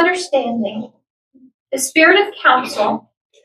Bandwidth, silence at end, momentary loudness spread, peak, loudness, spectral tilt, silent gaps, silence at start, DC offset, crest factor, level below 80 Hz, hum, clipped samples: 14.5 kHz; 0.45 s; 16 LU; 0 dBFS; -15 LUFS; -2 dB/octave; 1.10-1.31 s, 1.54-1.66 s; 0 s; under 0.1%; 18 dB; -68 dBFS; none; under 0.1%